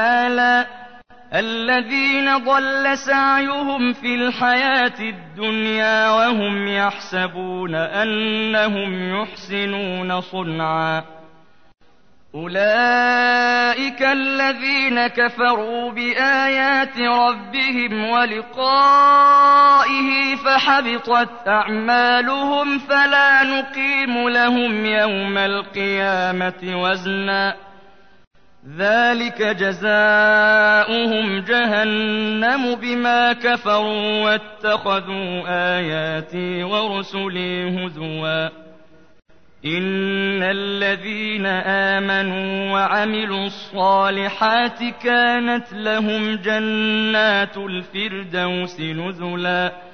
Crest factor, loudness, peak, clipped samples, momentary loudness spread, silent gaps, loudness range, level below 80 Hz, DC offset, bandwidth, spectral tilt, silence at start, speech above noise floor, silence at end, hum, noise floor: 14 dB; -18 LUFS; -6 dBFS; under 0.1%; 10 LU; 28.27-28.31 s; 8 LU; -62 dBFS; 0.5%; 6.6 kHz; -5 dB/octave; 0 s; 38 dB; 0 s; none; -56 dBFS